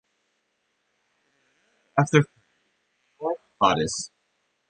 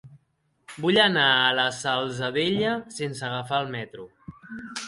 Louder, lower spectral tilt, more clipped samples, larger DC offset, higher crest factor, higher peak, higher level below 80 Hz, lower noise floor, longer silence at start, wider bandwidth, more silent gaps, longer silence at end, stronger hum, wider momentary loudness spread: about the same, -24 LUFS vs -23 LUFS; about the same, -5 dB/octave vs -4 dB/octave; neither; neither; about the same, 24 dB vs 20 dB; about the same, -4 dBFS vs -6 dBFS; about the same, -60 dBFS vs -64 dBFS; first, -74 dBFS vs -70 dBFS; first, 1.95 s vs 0.05 s; second, 9.8 kHz vs 11.5 kHz; neither; first, 0.65 s vs 0 s; neither; second, 12 LU vs 22 LU